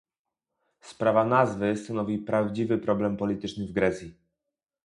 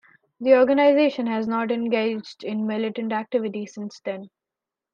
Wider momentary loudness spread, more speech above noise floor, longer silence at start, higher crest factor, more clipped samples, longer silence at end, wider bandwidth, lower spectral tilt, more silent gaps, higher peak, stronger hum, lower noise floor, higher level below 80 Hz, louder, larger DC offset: second, 8 LU vs 16 LU; second, 61 dB vs 66 dB; first, 0.85 s vs 0.4 s; about the same, 22 dB vs 18 dB; neither; about the same, 0.75 s vs 0.65 s; first, 11 kHz vs 7.2 kHz; about the same, -7 dB/octave vs -6.5 dB/octave; neither; about the same, -6 dBFS vs -4 dBFS; neither; about the same, -87 dBFS vs -88 dBFS; first, -58 dBFS vs -72 dBFS; second, -27 LUFS vs -23 LUFS; neither